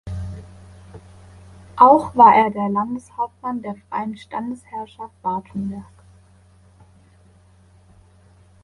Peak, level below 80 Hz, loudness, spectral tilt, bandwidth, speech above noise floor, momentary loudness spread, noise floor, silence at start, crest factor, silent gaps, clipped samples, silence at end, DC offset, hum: 0 dBFS; -48 dBFS; -18 LUFS; -7.5 dB/octave; 11.5 kHz; 33 dB; 22 LU; -52 dBFS; 0.05 s; 22 dB; none; under 0.1%; 2.8 s; under 0.1%; none